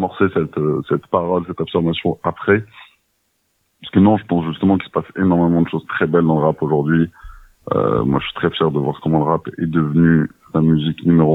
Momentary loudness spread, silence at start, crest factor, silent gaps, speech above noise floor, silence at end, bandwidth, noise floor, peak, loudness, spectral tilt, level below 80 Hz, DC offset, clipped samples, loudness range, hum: 6 LU; 0 s; 16 dB; none; 50 dB; 0 s; 4 kHz; -67 dBFS; 0 dBFS; -17 LUFS; -9.5 dB/octave; -46 dBFS; under 0.1%; under 0.1%; 3 LU; none